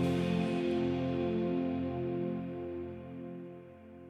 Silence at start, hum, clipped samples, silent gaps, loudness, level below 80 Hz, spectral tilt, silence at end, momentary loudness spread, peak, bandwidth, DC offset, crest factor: 0 s; none; under 0.1%; none; -35 LUFS; -66 dBFS; -8 dB/octave; 0 s; 14 LU; -22 dBFS; 11.5 kHz; under 0.1%; 14 dB